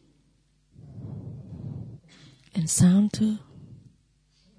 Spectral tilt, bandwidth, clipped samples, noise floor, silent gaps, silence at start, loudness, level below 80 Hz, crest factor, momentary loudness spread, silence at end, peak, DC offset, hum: -5.5 dB/octave; 11 kHz; under 0.1%; -65 dBFS; none; 0.9 s; -23 LUFS; -56 dBFS; 18 dB; 23 LU; 0.85 s; -10 dBFS; under 0.1%; none